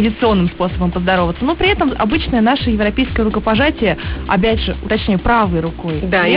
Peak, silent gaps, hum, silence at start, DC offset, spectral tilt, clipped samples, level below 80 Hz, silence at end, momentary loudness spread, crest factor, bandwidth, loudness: -2 dBFS; none; none; 0 s; 0.2%; -11 dB/octave; under 0.1%; -26 dBFS; 0 s; 4 LU; 12 dB; 5.4 kHz; -15 LUFS